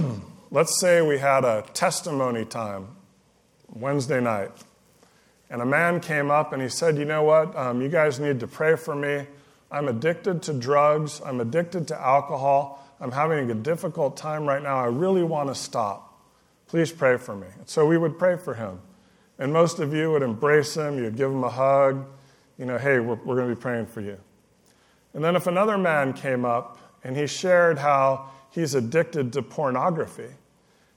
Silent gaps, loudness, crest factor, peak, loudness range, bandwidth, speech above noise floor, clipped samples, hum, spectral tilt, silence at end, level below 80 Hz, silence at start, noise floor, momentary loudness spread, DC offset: none; -24 LUFS; 18 dB; -6 dBFS; 4 LU; 17 kHz; 38 dB; under 0.1%; none; -5.5 dB/octave; 0.6 s; -70 dBFS; 0 s; -61 dBFS; 13 LU; under 0.1%